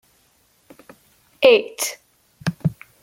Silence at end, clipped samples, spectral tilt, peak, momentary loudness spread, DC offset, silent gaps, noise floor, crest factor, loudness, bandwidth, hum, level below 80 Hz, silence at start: 0.3 s; under 0.1%; -4 dB/octave; -2 dBFS; 14 LU; under 0.1%; none; -60 dBFS; 20 dB; -20 LUFS; 16.5 kHz; none; -58 dBFS; 1.4 s